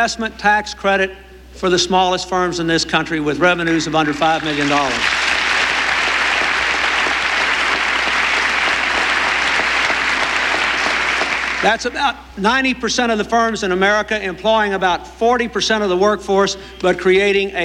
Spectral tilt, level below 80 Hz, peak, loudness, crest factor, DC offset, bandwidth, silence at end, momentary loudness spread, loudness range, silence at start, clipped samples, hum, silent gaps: -3 dB/octave; -42 dBFS; -2 dBFS; -16 LUFS; 14 dB; under 0.1%; 15 kHz; 0 s; 4 LU; 2 LU; 0 s; under 0.1%; none; none